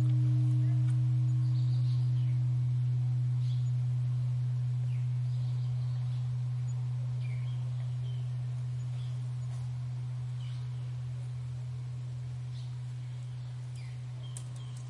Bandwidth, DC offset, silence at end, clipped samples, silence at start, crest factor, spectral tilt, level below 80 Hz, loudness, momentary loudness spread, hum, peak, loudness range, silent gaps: 10.5 kHz; under 0.1%; 0 s; under 0.1%; 0 s; 10 dB; -8 dB/octave; -62 dBFS; -33 LUFS; 11 LU; none; -22 dBFS; 9 LU; none